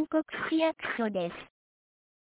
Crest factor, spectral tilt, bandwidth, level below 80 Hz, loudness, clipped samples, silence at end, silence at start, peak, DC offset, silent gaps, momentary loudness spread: 16 dB; -3.5 dB/octave; 4 kHz; -70 dBFS; -31 LUFS; under 0.1%; 0.8 s; 0 s; -16 dBFS; under 0.1%; none; 8 LU